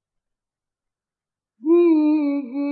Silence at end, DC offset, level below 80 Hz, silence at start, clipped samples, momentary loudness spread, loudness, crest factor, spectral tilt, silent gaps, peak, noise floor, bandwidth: 0 s; under 0.1%; -88 dBFS; 1.65 s; under 0.1%; 9 LU; -18 LUFS; 14 dB; -9.5 dB/octave; none; -8 dBFS; -90 dBFS; 4.5 kHz